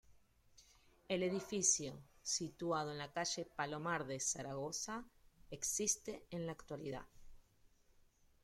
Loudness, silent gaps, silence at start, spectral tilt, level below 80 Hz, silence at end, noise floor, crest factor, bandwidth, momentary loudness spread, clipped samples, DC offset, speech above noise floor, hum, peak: -41 LUFS; none; 0.1 s; -2.5 dB/octave; -68 dBFS; 1.05 s; -70 dBFS; 22 dB; 16.5 kHz; 13 LU; under 0.1%; under 0.1%; 29 dB; none; -20 dBFS